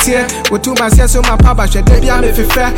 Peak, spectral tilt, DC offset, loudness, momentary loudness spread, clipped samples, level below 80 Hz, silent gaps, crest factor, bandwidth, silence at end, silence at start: 0 dBFS; -4.5 dB/octave; under 0.1%; -11 LUFS; 3 LU; under 0.1%; -10 dBFS; none; 8 dB; 17 kHz; 0 s; 0 s